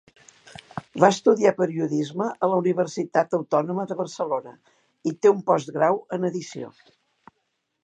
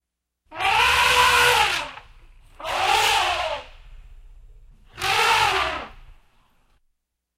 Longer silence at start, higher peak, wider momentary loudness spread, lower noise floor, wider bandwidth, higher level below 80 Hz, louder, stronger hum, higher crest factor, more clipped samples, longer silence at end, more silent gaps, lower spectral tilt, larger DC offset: first, 0.75 s vs 0.5 s; first, 0 dBFS vs -4 dBFS; second, 14 LU vs 18 LU; about the same, -75 dBFS vs -74 dBFS; second, 9.2 kHz vs 16 kHz; second, -72 dBFS vs -46 dBFS; second, -23 LUFS vs -19 LUFS; neither; about the same, 24 dB vs 20 dB; neither; about the same, 1.15 s vs 1.25 s; neither; first, -6 dB/octave vs -0.5 dB/octave; neither